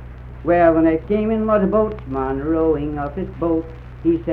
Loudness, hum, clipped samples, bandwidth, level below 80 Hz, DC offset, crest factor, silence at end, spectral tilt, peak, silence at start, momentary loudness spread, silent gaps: -19 LUFS; none; under 0.1%; 4.2 kHz; -36 dBFS; under 0.1%; 16 dB; 0 s; -10.5 dB/octave; -2 dBFS; 0 s; 11 LU; none